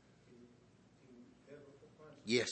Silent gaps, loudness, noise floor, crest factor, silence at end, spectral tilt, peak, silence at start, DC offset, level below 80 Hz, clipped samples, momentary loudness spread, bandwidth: none; -38 LUFS; -66 dBFS; 24 dB; 0 s; -3.5 dB/octave; -20 dBFS; 1.1 s; under 0.1%; -80 dBFS; under 0.1%; 28 LU; 8.4 kHz